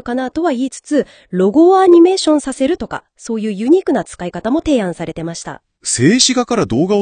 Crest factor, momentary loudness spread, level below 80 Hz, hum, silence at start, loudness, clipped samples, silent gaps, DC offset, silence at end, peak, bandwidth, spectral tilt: 14 dB; 16 LU; -46 dBFS; none; 0.05 s; -14 LUFS; under 0.1%; none; under 0.1%; 0 s; 0 dBFS; 10 kHz; -4.5 dB/octave